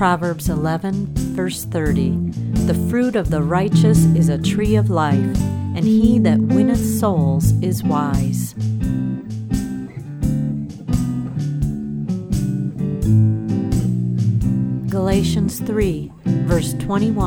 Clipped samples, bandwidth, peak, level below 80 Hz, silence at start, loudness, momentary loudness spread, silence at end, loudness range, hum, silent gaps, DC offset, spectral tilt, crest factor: under 0.1%; 18 kHz; -2 dBFS; -32 dBFS; 0 s; -19 LUFS; 8 LU; 0 s; 7 LU; none; none; under 0.1%; -7 dB/octave; 16 dB